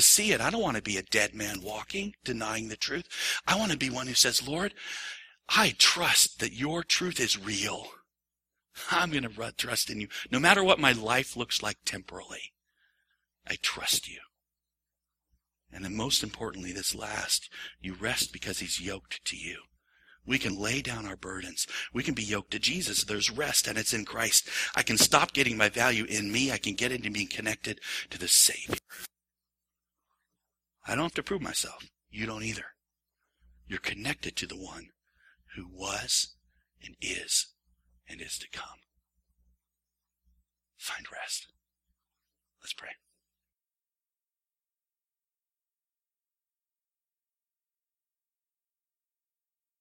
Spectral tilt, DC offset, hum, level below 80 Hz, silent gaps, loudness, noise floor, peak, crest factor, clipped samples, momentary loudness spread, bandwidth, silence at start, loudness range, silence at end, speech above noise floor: -1.5 dB/octave; under 0.1%; none; -60 dBFS; none; -28 LUFS; under -90 dBFS; -2 dBFS; 30 dB; under 0.1%; 18 LU; 16.5 kHz; 0 s; 17 LU; 6.85 s; over 60 dB